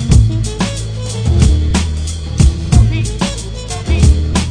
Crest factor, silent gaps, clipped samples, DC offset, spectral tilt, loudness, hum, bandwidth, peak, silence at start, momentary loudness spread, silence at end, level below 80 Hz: 12 dB; none; 0.1%; under 0.1%; -5.5 dB/octave; -14 LUFS; none; 10 kHz; 0 dBFS; 0 s; 10 LU; 0 s; -16 dBFS